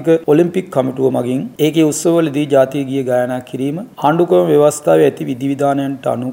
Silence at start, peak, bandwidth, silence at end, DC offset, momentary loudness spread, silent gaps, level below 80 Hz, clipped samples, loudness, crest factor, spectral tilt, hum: 0 s; 0 dBFS; 16.5 kHz; 0 s; under 0.1%; 8 LU; none; -60 dBFS; under 0.1%; -15 LUFS; 14 dB; -6 dB/octave; none